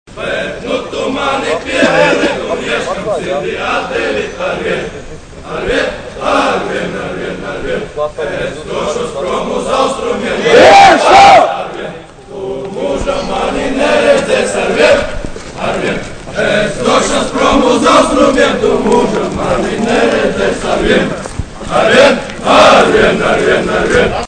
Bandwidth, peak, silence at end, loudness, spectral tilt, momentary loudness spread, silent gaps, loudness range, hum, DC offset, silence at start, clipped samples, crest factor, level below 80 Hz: 11 kHz; 0 dBFS; 0 s; -11 LUFS; -4 dB/octave; 15 LU; none; 9 LU; none; under 0.1%; 0.1 s; 1%; 12 dB; -32 dBFS